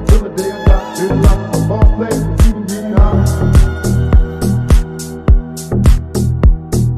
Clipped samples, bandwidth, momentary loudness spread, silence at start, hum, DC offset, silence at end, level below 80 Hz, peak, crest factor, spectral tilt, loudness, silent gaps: under 0.1%; 14 kHz; 5 LU; 0 s; none; under 0.1%; 0 s; -12 dBFS; 0 dBFS; 10 dB; -7 dB/octave; -14 LUFS; none